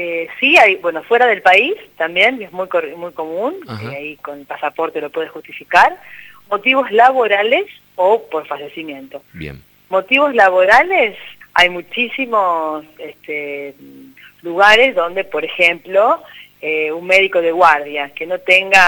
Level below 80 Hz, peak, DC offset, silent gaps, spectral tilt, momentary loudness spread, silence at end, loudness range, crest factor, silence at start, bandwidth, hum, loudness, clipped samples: -54 dBFS; 0 dBFS; under 0.1%; none; -3.5 dB/octave; 18 LU; 0 s; 6 LU; 16 dB; 0 s; over 20 kHz; 50 Hz at -60 dBFS; -14 LUFS; under 0.1%